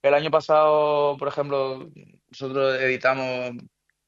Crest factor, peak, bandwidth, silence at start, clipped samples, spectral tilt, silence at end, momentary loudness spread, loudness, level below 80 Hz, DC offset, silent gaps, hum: 16 dB; -6 dBFS; 7.4 kHz; 0.05 s; under 0.1%; -6 dB/octave; 0.45 s; 15 LU; -22 LUFS; -70 dBFS; under 0.1%; none; none